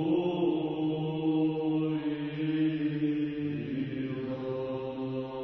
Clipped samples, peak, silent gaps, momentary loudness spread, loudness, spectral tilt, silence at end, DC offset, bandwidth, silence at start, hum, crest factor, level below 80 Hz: under 0.1%; -18 dBFS; none; 7 LU; -31 LUFS; -10 dB/octave; 0 s; under 0.1%; 4.4 kHz; 0 s; none; 12 dB; -64 dBFS